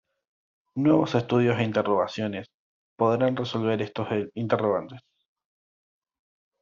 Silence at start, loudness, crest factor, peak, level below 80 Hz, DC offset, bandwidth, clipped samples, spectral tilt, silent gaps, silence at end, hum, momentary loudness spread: 0.75 s; -25 LUFS; 20 dB; -8 dBFS; -66 dBFS; under 0.1%; 7.4 kHz; under 0.1%; -6 dB/octave; 2.54-2.96 s; 1.65 s; none; 9 LU